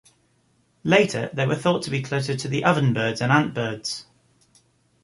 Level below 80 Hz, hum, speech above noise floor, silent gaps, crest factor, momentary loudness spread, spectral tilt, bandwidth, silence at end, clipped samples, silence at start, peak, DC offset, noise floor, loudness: -60 dBFS; none; 42 dB; none; 22 dB; 10 LU; -5.5 dB/octave; 11.5 kHz; 1 s; under 0.1%; 0.85 s; -2 dBFS; under 0.1%; -64 dBFS; -22 LUFS